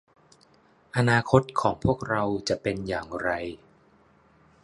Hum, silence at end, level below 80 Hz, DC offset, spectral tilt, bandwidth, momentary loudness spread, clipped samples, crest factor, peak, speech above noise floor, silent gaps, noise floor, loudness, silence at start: none; 1.05 s; -50 dBFS; under 0.1%; -6 dB/octave; 11.5 kHz; 11 LU; under 0.1%; 24 dB; -4 dBFS; 35 dB; none; -60 dBFS; -26 LUFS; 0.95 s